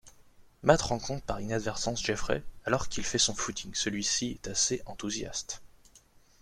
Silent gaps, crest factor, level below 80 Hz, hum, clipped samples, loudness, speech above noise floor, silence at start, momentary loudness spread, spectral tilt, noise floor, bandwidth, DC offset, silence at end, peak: none; 24 dB; -48 dBFS; none; under 0.1%; -31 LUFS; 29 dB; 0.05 s; 9 LU; -3 dB/octave; -60 dBFS; 14.5 kHz; under 0.1%; 0.45 s; -8 dBFS